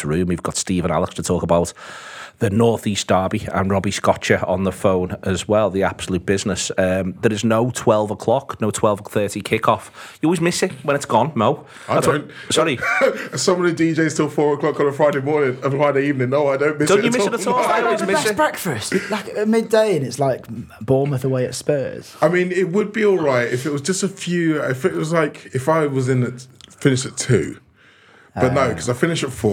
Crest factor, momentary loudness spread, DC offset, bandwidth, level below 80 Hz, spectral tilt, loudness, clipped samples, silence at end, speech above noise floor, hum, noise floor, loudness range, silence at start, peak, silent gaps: 18 dB; 6 LU; under 0.1%; 18.5 kHz; -54 dBFS; -5 dB/octave; -19 LUFS; under 0.1%; 0 s; 32 dB; none; -51 dBFS; 2 LU; 0 s; 0 dBFS; none